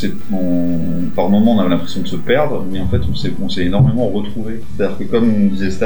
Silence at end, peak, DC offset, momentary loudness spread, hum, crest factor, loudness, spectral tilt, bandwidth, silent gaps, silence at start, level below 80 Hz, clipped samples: 0 s; -2 dBFS; 20%; 9 LU; none; 16 dB; -17 LUFS; -7.5 dB/octave; over 20 kHz; none; 0 s; -32 dBFS; under 0.1%